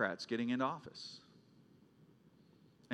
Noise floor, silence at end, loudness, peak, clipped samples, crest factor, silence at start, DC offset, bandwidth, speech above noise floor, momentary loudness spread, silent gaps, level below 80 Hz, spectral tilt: -66 dBFS; 0 s; -40 LUFS; -20 dBFS; under 0.1%; 22 dB; 0 s; under 0.1%; 9.8 kHz; 27 dB; 14 LU; none; -86 dBFS; -5 dB/octave